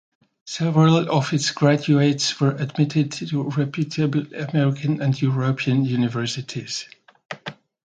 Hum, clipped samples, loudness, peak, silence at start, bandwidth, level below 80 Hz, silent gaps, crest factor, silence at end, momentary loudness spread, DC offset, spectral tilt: none; under 0.1%; -21 LUFS; -4 dBFS; 0.45 s; 9.2 kHz; -64 dBFS; 7.25-7.29 s; 18 dB; 0.3 s; 13 LU; under 0.1%; -6 dB/octave